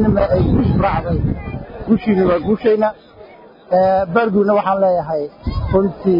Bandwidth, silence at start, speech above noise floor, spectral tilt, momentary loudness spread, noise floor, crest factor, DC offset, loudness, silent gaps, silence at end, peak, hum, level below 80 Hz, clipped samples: 5.4 kHz; 0 s; 26 dB; -11 dB/octave; 8 LU; -41 dBFS; 14 dB; under 0.1%; -16 LUFS; none; 0 s; -2 dBFS; none; -32 dBFS; under 0.1%